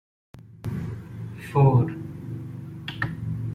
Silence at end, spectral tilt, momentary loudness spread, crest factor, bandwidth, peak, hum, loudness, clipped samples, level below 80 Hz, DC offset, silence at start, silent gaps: 0 s; -8.5 dB/octave; 18 LU; 20 dB; 9.6 kHz; -8 dBFS; none; -26 LUFS; under 0.1%; -52 dBFS; under 0.1%; 0.35 s; none